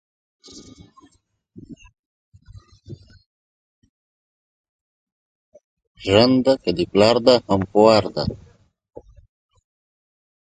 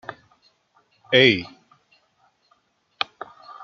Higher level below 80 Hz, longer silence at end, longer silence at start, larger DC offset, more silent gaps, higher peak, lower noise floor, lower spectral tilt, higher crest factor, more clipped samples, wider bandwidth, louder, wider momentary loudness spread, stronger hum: first, -48 dBFS vs -68 dBFS; first, 2.15 s vs 0 s; first, 0.55 s vs 0.1 s; neither; first, 1.99-2.32 s, 3.26-3.82 s, 3.89-5.52 s, 5.64-5.77 s, 5.87-5.95 s vs none; about the same, 0 dBFS vs -2 dBFS; about the same, -63 dBFS vs -65 dBFS; about the same, -6 dB/octave vs -5.5 dB/octave; about the same, 22 dB vs 24 dB; neither; first, 9.4 kHz vs 7.2 kHz; about the same, -17 LUFS vs -19 LUFS; second, 13 LU vs 25 LU; neither